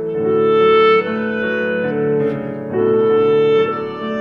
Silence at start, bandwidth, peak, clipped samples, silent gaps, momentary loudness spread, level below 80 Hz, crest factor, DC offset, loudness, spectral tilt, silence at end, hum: 0 s; 5.2 kHz; -4 dBFS; under 0.1%; none; 9 LU; -56 dBFS; 12 dB; under 0.1%; -16 LUFS; -8 dB/octave; 0 s; none